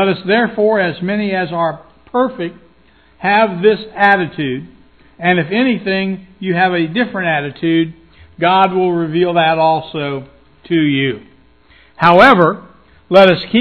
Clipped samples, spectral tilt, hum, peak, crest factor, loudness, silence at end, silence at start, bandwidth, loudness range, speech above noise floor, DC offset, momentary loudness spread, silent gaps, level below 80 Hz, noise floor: 0.2%; -8 dB/octave; none; 0 dBFS; 14 dB; -14 LUFS; 0 s; 0 s; 5.4 kHz; 3 LU; 37 dB; 0.2%; 12 LU; none; -50 dBFS; -50 dBFS